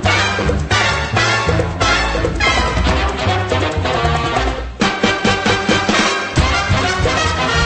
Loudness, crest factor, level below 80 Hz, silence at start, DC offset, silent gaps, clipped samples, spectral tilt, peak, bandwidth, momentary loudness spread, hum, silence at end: -15 LUFS; 14 dB; -24 dBFS; 0 s; under 0.1%; none; under 0.1%; -4 dB/octave; 0 dBFS; 8.8 kHz; 4 LU; none; 0 s